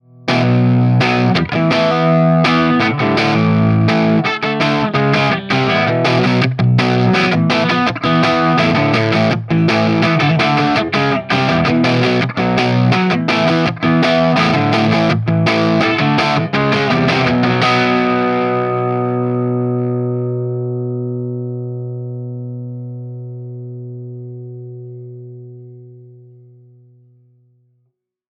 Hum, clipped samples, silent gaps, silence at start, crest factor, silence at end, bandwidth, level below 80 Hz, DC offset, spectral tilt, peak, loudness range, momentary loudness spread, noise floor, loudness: 60 Hz at -40 dBFS; under 0.1%; none; 0.25 s; 14 dB; 2.35 s; 9.6 kHz; -48 dBFS; under 0.1%; -7 dB/octave; 0 dBFS; 15 LU; 16 LU; -66 dBFS; -14 LUFS